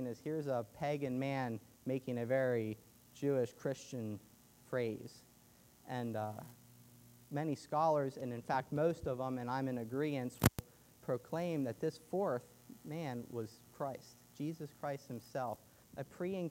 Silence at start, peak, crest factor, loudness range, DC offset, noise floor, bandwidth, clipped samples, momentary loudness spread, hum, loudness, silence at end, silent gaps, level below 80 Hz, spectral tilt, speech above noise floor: 0 s; -10 dBFS; 30 dB; 7 LU; under 0.1%; -65 dBFS; 16 kHz; under 0.1%; 15 LU; none; -40 LUFS; 0 s; none; -66 dBFS; -6.5 dB/octave; 26 dB